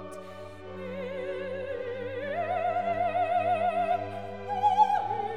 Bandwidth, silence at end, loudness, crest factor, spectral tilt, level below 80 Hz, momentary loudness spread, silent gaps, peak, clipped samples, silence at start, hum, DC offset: 10.5 kHz; 0 s; -29 LUFS; 18 dB; -6 dB/octave; -64 dBFS; 16 LU; none; -12 dBFS; under 0.1%; 0 s; none; 0.3%